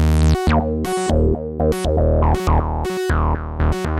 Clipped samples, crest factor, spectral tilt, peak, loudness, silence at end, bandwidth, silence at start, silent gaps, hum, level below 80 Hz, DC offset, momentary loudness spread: under 0.1%; 14 dB; -7 dB/octave; -4 dBFS; -19 LUFS; 0 s; 13.5 kHz; 0 s; none; none; -22 dBFS; under 0.1%; 5 LU